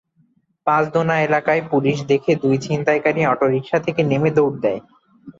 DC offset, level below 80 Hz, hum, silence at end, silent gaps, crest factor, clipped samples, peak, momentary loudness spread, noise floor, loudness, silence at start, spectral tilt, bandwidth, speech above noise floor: under 0.1%; -58 dBFS; none; 0.1 s; none; 16 dB; under 0.1%; -4 dBFS; 3 LU; -61 dBFS; -18 LUFS; 0.65 s; -7 dB/octave; 7.6 kHz; 43 dB